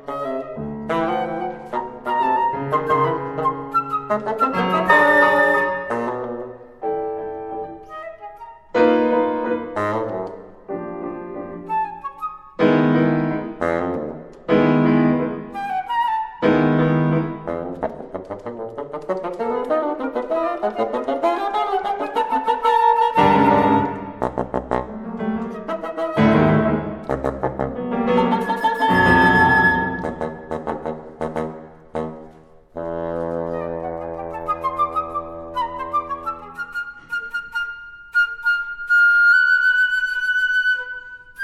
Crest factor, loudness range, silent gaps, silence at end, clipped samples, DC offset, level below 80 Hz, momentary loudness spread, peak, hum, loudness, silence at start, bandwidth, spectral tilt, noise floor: 20 dB; 9 LU; none; 0 s; under 0.1%; under 0.1%; -46 dBFS; 16 LU; -2 dBFS; none; -20 LUFS; 0.05 s; 13.5 kHz; -7 dB/octave; -46 dBFS